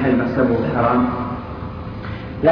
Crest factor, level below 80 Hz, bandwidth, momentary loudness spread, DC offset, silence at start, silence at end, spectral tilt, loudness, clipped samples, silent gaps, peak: 16 dB; -38 dBFS; 5.4 kHz; 13 LU; under 0.1%; 0 s; 0 s; -10 dB/octave; -20 LUFS; under 0.1%; none; -4 dBFS